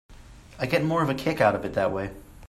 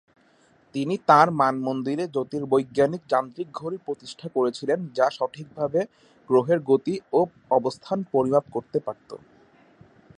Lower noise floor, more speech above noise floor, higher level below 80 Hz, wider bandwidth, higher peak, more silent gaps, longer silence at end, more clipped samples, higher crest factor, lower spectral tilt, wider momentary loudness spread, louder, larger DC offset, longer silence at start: second, -47 dBFS vs -60 dBFS; second, 22 dB vs 36 dB; first, -50 dBFS vs -68 dBFS; first, 14.5 kHz vs 10.5 kHz; second, -8 dBFS vs -2 dBFS; neither; second, 0 s vs 1 s; neither; about the same, 20 dB vs 22 dB; about the same, -6.5 dB/octave vs -6.5 dB/octave; second, 10 LU vs 13 LU; about the same, -25 LUFS vs -24 LUFS; neither; second, 0.1 s vs 0.75 s